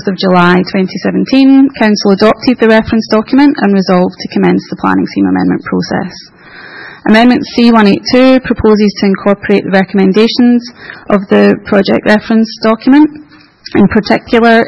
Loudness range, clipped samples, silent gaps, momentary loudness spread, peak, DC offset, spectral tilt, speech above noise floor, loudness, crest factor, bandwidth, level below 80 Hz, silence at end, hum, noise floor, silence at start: 3 LU; 1%; none; 7 LU; 0 dBFS; under 0.1%; -7 dB/octave; 22 dB; -9 LUFS; 8 dB; 8 kHz; -40 dBFS; 0 s; none; -30 dBFS; 0 s